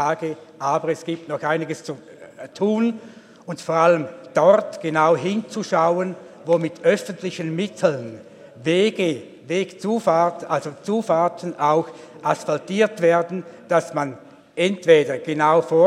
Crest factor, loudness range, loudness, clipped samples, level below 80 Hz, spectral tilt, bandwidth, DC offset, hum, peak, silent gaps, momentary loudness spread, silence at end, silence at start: 20 dB; 3 LU; -21 LUFS; under 0.1%; -76 dBFS; -5.5 dB/octave; 12.5 kHz; under 0.1%; none; -2 dBFS; none; 14 LU; 0 s; 0 s